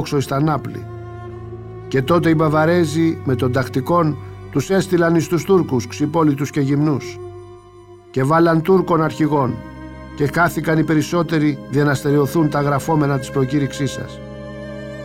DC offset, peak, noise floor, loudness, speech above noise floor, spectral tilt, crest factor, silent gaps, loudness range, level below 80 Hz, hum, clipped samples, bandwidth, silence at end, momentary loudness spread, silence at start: under 0.1%; -4 dBFS; -42 dBFS; -18 LUFS; 25 dB; -7 dB/octave; 14 dB; none; 2 LU; -46 dBFS; none; under 0.1%; 16.5 kHz; 0 s; 17 LU; 0 s